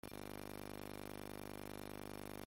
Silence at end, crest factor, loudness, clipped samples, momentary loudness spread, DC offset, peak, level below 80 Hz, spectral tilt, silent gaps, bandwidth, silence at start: 0 s; 16 dB; -51 LUFS; under 0.1%; 0 LU; under 0.1%; -34 dBFS; -64 dBFS; -5 dB/octave; none; 17 kHz; 0.05 s